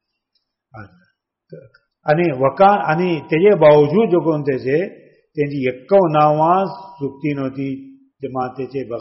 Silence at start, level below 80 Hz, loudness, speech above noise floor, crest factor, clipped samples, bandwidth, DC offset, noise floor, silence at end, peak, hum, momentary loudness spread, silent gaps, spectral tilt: 0.75 s; -58 dBFS; -16 LUFS; 55 dB; 16 dB; under 0.1%; 5.8 kHz; under 0.1%; -71 dBFS; 0 s; -2 dBFS; none; 16 LU; none; -6 dB/octave